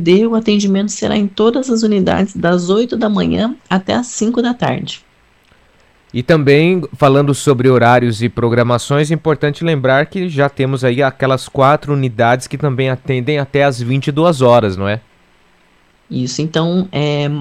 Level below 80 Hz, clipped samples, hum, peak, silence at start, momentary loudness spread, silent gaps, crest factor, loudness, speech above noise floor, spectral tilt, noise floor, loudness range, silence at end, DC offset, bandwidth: -46 dBFS; under 0.1%; none; 0 dBFS; 0 s; 7 LU; none; 12 dB; -14 LUFS; 39 dB; -6 dB/octave; -52 dBFS; 4 LU; 0 s; under 0.1%; 13.5 kHz